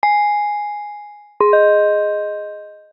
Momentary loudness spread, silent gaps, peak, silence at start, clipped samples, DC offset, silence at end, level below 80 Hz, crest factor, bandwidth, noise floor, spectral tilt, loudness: 20 LU; none; -2 dBFS; 0.05 s; under 0.1%; under 0.1%; 0.15 s; -70 dBFS; 16 dB; 5.4 kHz; -36 dBFS; 0 dB/octave; -16 LUFS